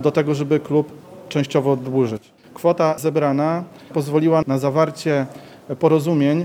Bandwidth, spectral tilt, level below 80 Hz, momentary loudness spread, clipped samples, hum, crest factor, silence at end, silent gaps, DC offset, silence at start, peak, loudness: 16.5 kHz; -7.5 dB/octave; -64 dBFS; 10 LU; under 0.1%; none; 18 dB; 0 s; none; under 0.1%; 0 s; -2 dBFS; -19 LUFS